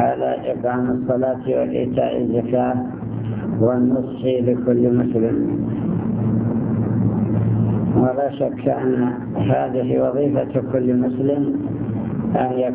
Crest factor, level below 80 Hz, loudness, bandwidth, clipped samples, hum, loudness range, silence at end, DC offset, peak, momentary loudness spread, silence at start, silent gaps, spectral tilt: 16 dB; -44 dBFS; -20 LUFS; 3.5 kHz; under 0.1%; none; 1 LU; 0 s; under 0.1%; -4 dBFS; 5 LU; 0 s; none; -13 dB/octave